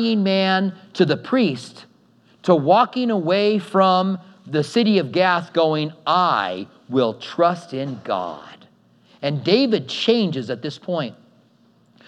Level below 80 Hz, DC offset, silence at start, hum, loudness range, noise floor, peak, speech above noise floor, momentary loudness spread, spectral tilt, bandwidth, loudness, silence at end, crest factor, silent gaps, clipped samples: -78 dBFS; under 0.1%; 0 s; none; 4 LU; -57 dBFS; -2 dBFS; 37 dB; 11 LU; -6.5 dB/octave; 11 kHz; -20 LUFS; 0.95 s; 18 dB; none; under 0.1%